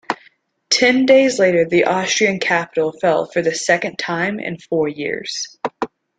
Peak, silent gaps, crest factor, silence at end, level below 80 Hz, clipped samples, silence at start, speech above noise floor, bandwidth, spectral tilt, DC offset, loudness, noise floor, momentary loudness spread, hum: -2 dBFS; none; 16 dB; 0.3 s; -60 dBFS; under 0.1%; 0.1 s; 37 dB; 9.4 kHz; -3.5 dB/octave; under 0.1%; -17 LUFS; -54 dBFS; 13 LU; none